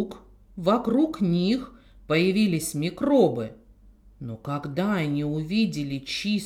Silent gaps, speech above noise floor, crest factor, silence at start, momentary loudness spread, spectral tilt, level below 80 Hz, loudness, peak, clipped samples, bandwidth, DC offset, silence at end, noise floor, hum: none; 28 dB; 18 dB; 0 s; 15 LU; -6 dB/octave; -54 dBFS; -25 LUFS; -8 dBFS; under 0.1%; 16 kHz; under 0.1%; 0 s; -53 dBFS; none